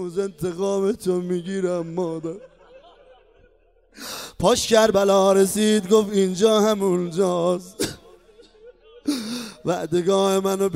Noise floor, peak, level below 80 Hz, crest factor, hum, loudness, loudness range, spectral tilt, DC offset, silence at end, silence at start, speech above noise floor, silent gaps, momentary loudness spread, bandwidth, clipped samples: -58 dBFS; -4 dBFS; -54 dBFS; 18 dB; none; -21 LUFS; 9 LU; -4.5 dB/octave; under 0.1%; 0 s; 0 s; 38 dB; none; 14 LU; 16 kHz; under 0.1%